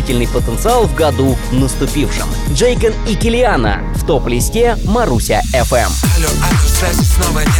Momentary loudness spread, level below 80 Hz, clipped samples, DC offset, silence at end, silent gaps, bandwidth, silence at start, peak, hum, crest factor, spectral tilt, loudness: 4 LU; -18 dBFS; under 0.1%; under 0.1%; 0 s; none; 19 kHz; 0 s; -2 dBFS; none; 10 dB; -5 dB/octave; -14 LUFS